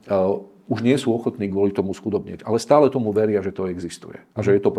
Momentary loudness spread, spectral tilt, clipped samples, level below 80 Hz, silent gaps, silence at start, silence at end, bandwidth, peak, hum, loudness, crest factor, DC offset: 12 LU; -7 dB/octave; under 0.1%; -62 dBFS; none; 0.05 s; 0 s; 12.5 kHz; -2 dBFS; none; -21 LUFS; 20 dB; under 0.1%